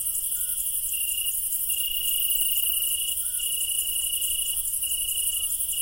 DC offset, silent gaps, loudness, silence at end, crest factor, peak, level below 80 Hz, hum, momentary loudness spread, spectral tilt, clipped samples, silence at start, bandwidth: under 0.1%; none; -23 LUFS; 0 s; 18 dB; -8 dBFS; -50 dBFS; none; 4 LU; 3.5 dB/octave; under 0.1%; 0 s; 17.5 kHz